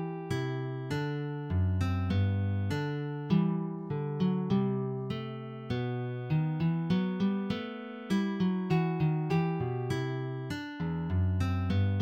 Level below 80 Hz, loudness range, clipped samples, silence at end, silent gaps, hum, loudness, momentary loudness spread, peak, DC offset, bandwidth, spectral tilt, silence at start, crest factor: -56 dBFS; 2 LU; under 0.1%; 0 s; none; none; -32 LUFS; 7 LU; -16 dBFS; under 0.1%; 8.8 kHz; -8 dB/octave; 0 s; 16 dB